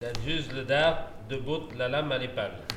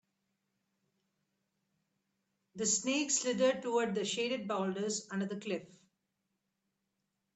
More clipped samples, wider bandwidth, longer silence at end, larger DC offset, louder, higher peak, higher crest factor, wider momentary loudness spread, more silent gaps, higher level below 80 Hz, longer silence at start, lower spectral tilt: neither; first, 14.5 kHz vs 9.2 kHz; second, 0 s vs 1.7 s; neither; first, -30 LUFS vs -34 LUFS; first, -8 dBFS vs -18 dBFS; about the same, 22 dB vs 20 dB; first, 11 LU vs 8 LU; neither; first, -46 dBFS vs -82 dBFS; second, 0 s vs 2.55 s; first, -5 dB/octave vs -3 dB/octave